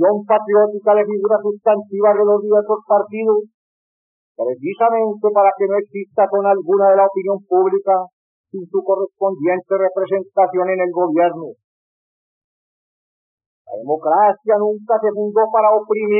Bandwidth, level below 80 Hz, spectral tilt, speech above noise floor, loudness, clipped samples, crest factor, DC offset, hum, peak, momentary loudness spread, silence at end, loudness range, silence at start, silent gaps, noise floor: 3.5 kHz; under -90 dBFS; -6.5 dB/octave; over 74 dB; -16 LUFS; under 0.1%; 14 dB; under 0.1%; none; -4 dBFS; 8 LU; 0 s; 5 LU; 0 s; 3.54-4.35 s, 8.13-8.44 s, 11.64-13.38 s, 13.46-13.65 s; under -90 dBFS